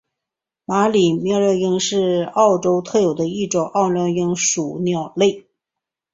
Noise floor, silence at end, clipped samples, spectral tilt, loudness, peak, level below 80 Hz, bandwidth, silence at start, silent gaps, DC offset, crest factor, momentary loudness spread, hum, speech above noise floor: -85 dBFS; 0.75 s; under 0.1%; -4.5 dB/octave; -18 LUFS; -2 dBFS; -60 dBFS; 8 kHz; 0.7 s; none; under 0.1%; 16 dB; 6 LU; none; 67 dB